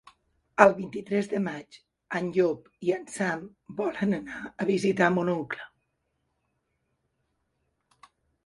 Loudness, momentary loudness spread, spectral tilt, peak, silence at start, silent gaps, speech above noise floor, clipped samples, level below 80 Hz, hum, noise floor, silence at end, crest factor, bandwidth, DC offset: -27 LUFS; 16 LU; -6 dB/octave; 0 dBFS; 0.6 s; none; 50 dB; under 0.1%; -68 dBFS; none; -77 dBFS; 2.8 s; 28 dB; 11.5 kHz; under 0.1%